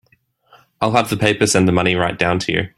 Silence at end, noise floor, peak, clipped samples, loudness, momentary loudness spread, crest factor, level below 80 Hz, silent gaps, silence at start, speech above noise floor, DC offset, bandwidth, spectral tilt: 0.1 s; -60 dBFS; 0 dBFS; under 0.1%; -16 LUFS; 4 LU; 18 dB; -48 dBFS; none; 0.8 s; 43 dB; under 0.1%; 15.5 kHz; -4.5 dB/octave